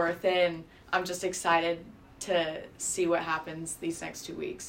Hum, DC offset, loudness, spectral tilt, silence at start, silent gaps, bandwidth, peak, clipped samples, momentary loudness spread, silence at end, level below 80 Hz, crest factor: none; under 0.1%; -30 LUFS; -3 dB/octave; 0 s; none; 16 kHz; -12 dBFS; under 0.1%; 11 LU; 0 s; -62 dBFS; 20 dB